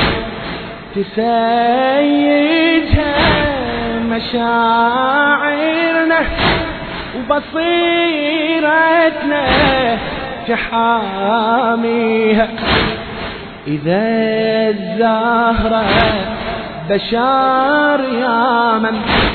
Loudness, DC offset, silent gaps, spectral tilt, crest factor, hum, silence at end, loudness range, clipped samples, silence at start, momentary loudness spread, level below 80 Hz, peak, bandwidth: -14 LUFS; under 0.1%; none; -8.5 dB/octave; 14 dB; none; 0 s; 2 LU; under 0.1%; 0 s; 10 LU; -32 dBFS; 0 dBFS; 4.6 kHz